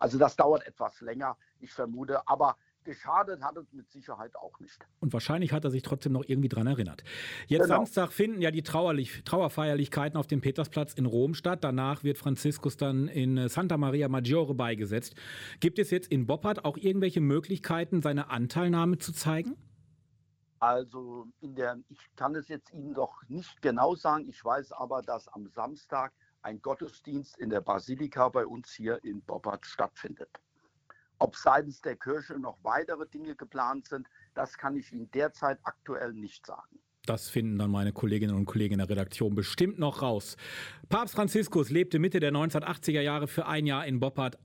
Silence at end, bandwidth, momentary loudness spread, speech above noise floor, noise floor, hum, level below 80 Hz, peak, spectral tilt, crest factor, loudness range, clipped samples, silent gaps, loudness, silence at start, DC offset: 0.1 s; 17 kHz; 15 LU; 39 dB; -70 dBFS; none; -66 dBFS; -10 dBFS; -6.5 dB/octave; 22 dB; 6 LU; under 0.1%; none; -31 LUFS; 0 s; under 0.1%